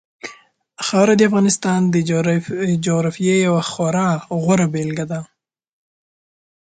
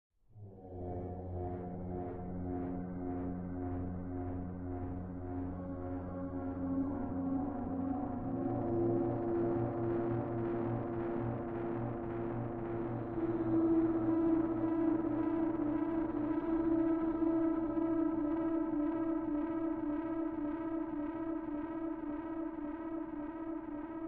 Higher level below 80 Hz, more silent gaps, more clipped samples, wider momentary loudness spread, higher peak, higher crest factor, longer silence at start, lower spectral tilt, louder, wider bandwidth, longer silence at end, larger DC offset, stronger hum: about the same, -58 dBFS vs -56 dBFS; neither; neither; about the same, 12 LU vs 10 LU; first, -2 dBFS vs -22 dBFS; about the same, 16 dB vs 14 dB; about the same, 0.25 s vs 0.35 s; second, -5.5 dB/octave vs -10 dB/octave; first, -17 LUFS vs -37 LUFS; first, 9.4 kHz vs 3.5 kHz; first, 1.45 s vs 0 s; neither; neither